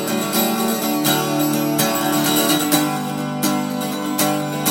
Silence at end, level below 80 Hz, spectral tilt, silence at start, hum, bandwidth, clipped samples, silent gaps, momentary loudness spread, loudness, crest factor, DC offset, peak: 0 s; -66 dBFS; -3.5 dB/octave; 0 s; none; 17 kHz; under 0.1%; none; 6 LU; -18 LUFS; 16 dB; under 0.1%; -2 dBFS